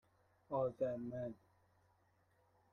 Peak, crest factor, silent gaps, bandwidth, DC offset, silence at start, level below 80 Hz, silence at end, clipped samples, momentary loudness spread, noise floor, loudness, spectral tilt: -28 dBFS; 20 dB; none; 6.8 kHz; under 0.1%; 0.5 s; -76 dBFS; 1.4 s; under 0.1%; 10 LU; -76 dBFS; -43 LUFS; -9.5 dB/octave